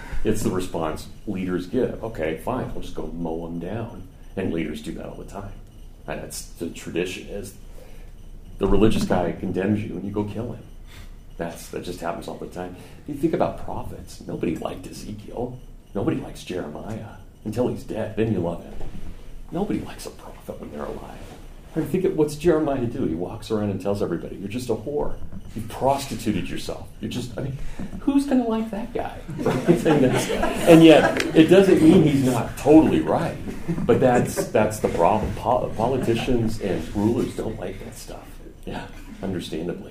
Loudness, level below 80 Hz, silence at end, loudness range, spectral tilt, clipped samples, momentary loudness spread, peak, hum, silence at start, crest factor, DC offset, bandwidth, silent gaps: -23 LUFS; -38 dBFS; 0 s; 15 LU; -6.5 dB/octave; under 0.1%; 19 LU; 0 dBFS; none; 0 s; 22 dB; under 0.1%; 15.5 kHz; none